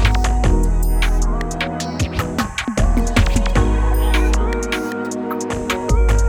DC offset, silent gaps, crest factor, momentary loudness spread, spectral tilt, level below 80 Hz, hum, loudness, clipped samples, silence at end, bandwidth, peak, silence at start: under 0.1%; none; 14 dB; 6 LU; -5.5 dB/octave; -18 dBFS; none; -19 LUFS; under 0.1%; 0 s; 16 kHz; -2 dBFS; 0 s